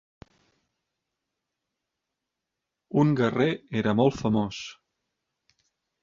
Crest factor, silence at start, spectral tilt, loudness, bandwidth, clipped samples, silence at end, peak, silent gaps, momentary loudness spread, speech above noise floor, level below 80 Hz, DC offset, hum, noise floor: 20 dB; 2.95 s; -7 dB/octave; -25 LUFS; 7.4 kHz; under 0.1%; 1.3 s; -8 dBFS; none; 10 LU; 61 dB; -60 dBFS; under 0.1%; none; -85 dBFS